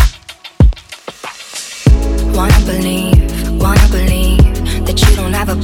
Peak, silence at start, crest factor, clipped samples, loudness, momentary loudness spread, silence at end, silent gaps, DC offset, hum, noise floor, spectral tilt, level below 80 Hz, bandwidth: 0 dBFS; 0 s; 10 dB; 0.1%; -12 LUFS; 16 LU; 0 s; none; under 0.1%; none; -34 dBFS; -5.5 dB/octave; -12 dBFS; 17 kHz